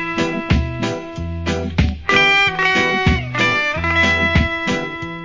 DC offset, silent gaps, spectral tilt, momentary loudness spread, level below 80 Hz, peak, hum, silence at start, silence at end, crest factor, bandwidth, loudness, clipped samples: under 0.1%; none; -5 dB/octave; 11 LU; -28 dBFS; 0 dBFS; none; 0 s; 0 s; 18 dB; 7.6 kHz; -16 LUFS; under 0.1%